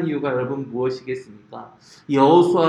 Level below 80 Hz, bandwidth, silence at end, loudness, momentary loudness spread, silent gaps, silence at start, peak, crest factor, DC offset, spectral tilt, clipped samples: -64 dBFS; 10 kHz; 0 s; -20 LUFS; 25 LU; none; 0 s; -2 dBFS; 18 dB; under 0.1%; -7.5 dB/octave; under 0.1%